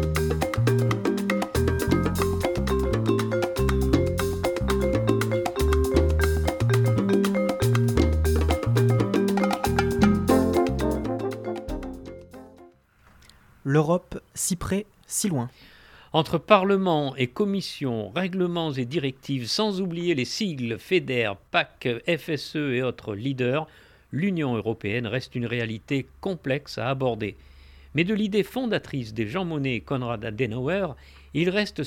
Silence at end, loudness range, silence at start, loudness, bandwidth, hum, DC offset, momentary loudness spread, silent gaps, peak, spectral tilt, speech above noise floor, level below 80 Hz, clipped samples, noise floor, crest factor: 0 s; 6 LU; 0 s; -25 LUFS; 19 kHz; none; under 0.1%; 8 LU; none; -2 dBFS; -6 dB/octave; 31 dB; -36 dBFS; under 0.1%; -57 dBFS; 22 dB